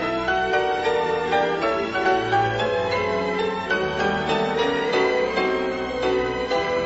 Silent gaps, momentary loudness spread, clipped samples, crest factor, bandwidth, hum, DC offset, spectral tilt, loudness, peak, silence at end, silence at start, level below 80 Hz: none; 3 LU; under 0.1%; 14 dB; 8 kHz; none; 0.1%; -5 dB/octave; -22 LUFS; -8 dBFS; 0 s; 0 s; -48 dBFS